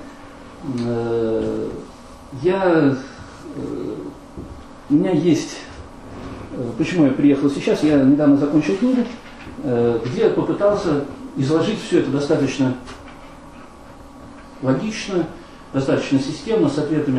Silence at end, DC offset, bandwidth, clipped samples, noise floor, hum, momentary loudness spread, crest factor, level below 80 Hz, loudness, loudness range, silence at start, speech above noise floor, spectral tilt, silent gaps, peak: 0 s; under 0.1%; 11 kHz; under 0.1%; -40 dBFS; none; 22 LU; 18 dB; -46 dBFS; -19 LUFS; 6 LU; 0 s; 22 dB; -7 dB/octave; none; -2 dBFS